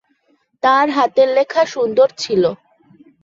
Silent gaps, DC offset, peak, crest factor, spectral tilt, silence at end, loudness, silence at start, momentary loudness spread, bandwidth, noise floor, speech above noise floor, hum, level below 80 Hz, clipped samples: none; under 0.1%; -2 dBFS; 14 dB; -4.5 dB/octave; 0.7 s; -15 LUFS; 0.65 s; 5 LU; 7.6 kHz; -61 dBFS; 47 dB; none; -64 dBFS; under 0.1%